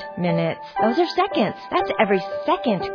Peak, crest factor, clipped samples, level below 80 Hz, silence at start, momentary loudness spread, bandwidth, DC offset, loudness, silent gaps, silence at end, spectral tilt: -4 dBFS; 18 dB; under 0.1%; -56 dBFS; 0 s; 4 LU; 5.4 kHz; under 0.1%; -22 LUFS; none; 0 s; -7.5 dB/octave